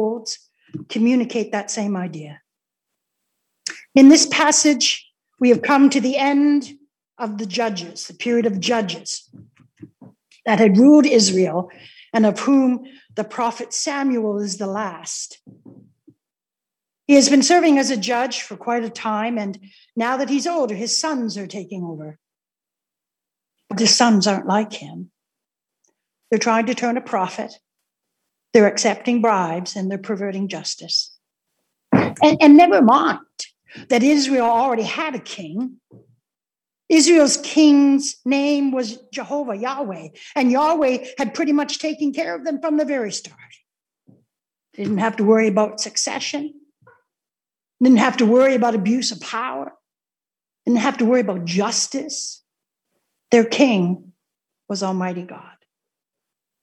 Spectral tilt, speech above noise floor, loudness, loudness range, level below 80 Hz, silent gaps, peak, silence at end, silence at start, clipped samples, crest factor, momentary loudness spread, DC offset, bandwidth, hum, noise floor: -4 dB/octave; over 72 dB; -18 LUFS; 8 LU; -70 dBFS; none; 0 dBFS; 1.2 s; 0 s; under 0.1%; 20 dB; 17 LU; under 0.1%; 11.5 kHz; none; under -90 dBFS